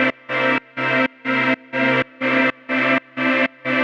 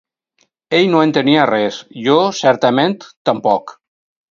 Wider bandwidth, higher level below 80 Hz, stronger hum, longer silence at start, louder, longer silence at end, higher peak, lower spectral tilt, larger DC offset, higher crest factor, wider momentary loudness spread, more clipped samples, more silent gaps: about the same, 7.6 kHz vs 7.6 kHz; second, -68 dBFS vs -62 dBFS; neither; second, 0 s vs 0.7 s; second, -19 LUFS vs -15 LUFS; second, 0 s vs 0.6 s; second, -4 dBFS vs 0 dBFS; about the same, -6 dB/octave vs -5.5 dB/octave; neither; about the same, 16 dB vs 16 dB; second, 2 LU vs 7 LU; neither; second, none vs 3.17-3.25 s